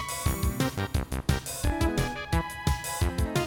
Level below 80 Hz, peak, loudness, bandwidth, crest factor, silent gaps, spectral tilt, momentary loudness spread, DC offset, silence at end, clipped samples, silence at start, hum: -34 dBFS; -12 dBFS; -29 LUFS; over 20 kHz; 16 dB; none; -5 dB/octave; 3 LU; under 0.1%; 0 s; under 0.1%; 0 s; none